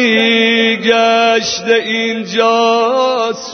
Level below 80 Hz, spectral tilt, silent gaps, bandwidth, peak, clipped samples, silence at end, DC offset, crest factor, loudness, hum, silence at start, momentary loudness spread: -60 dBFS; -3 dB/octave; none; 6.6 kHz; 0 dBFS; under 0.1%; 0 s; under 0.1%; 12 dB; -12 LUFS; none; 0 s; 6 LU